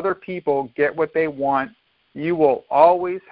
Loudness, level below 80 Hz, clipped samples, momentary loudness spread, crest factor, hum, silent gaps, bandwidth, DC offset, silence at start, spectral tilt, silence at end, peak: -20 LUFS; -60 dBFS; under 0.1%; 10 LU; 20 dB; none; none; 5.2 kHz; under 0.1%; 0 s; -11 dB/octave; 0.15 s; 0 dBFS